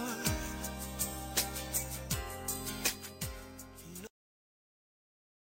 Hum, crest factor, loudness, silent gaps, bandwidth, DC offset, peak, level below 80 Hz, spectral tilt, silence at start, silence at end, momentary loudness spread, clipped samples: none; 26 dB; -36 LUFS; none; 16 kHz; under 0.1%; -12 dBFS; -50 dBFS; -2.5 dB/octave; 0 s; 1.4 s; 14 LU; under 0.1%